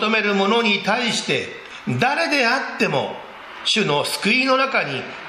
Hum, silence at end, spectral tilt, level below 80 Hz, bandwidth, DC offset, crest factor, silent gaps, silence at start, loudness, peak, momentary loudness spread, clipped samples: none; 0 s; -3.5 dB/octave; -64 dBFS; 14 kHz; under 0.1%; 18 dB; none; 0 s; -19 LUFS; -4 dBFS; 10 LU; under 0.1%